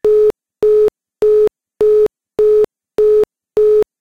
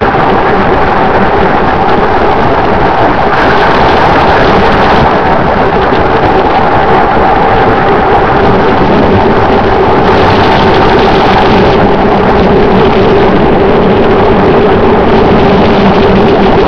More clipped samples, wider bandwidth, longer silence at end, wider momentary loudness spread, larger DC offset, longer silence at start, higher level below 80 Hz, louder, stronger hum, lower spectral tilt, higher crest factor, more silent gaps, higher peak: second, under 0.1% vs 2%; second, 4.9 kHz vs 5.4 kHz; first, 0.15 s vs 0 s; first, 5 LU vs 2 LU; second, 0.5% vs 10%; about the same, 0.05 s vs 0 s; second, -44 dBFS vs -20 dBFS; second, -14 LUFS vs -6 LUFS; neither; about the same, -6.5 dB/octave vs -7.5 dB/octave; about the same, 8 dB vs 6 dB; neither; second, -6 dBFS vs 0 dBFS